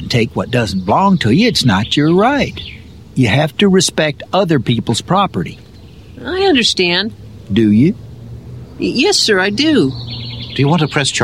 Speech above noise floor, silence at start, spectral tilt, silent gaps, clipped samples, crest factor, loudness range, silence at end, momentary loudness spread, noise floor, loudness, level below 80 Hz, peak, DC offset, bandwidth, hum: 24 dB; 0 s; -5 dB/octave; none; under 0.1%; 14 dB; 2 LU; 0 s; 14 LU; -37 dBFS; -13 LUFS; -42 dBFS; -2 dBFS; 0.3%; 15.5 kHz; none